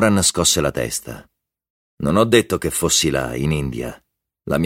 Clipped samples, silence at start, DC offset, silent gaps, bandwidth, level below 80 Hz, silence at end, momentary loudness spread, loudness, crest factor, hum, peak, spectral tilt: under 0.1%; 0 s; under 0.1%; 1.70-1.98 s; 16.5 kHz; -40 dBFS; 0 s; 16 LU; -18 LUFS; 18 dB; none; -2 dBFS; -3.5 dB/octave